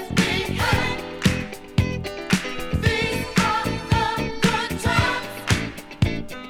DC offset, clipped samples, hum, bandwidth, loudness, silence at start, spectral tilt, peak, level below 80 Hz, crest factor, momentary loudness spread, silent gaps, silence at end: under 0.1%; under 0.1%; none; 19 kHz; -23 LUFS; 0 s; -5 dB/octave; -4 dBFS; -36 dBFS; 20 dB; 6 LU; none; 0 s